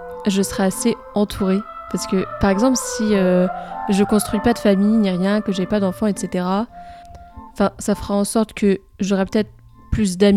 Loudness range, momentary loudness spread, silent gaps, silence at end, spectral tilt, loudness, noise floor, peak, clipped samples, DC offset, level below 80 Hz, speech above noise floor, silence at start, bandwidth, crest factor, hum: 4 LU; 7 LU; none; 0 s; -5.5 dB/octave; -19 LUFS; -39 dBFS; -2 dBFS; under 0.1%; under 0.1%; -40 dBFS; 21 dB; 0 s; 15 kHz; 16 dB; none